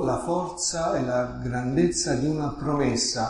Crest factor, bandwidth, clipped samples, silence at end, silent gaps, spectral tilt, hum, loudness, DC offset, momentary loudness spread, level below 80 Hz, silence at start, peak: 16 dB; 11.5 kHz; under 0.1%; 0 s; none; -4.5 dB/octave; none; -25 LUFS; under 0.1%; 5 LU; -46 dBFS; 0 s; -10 dBFS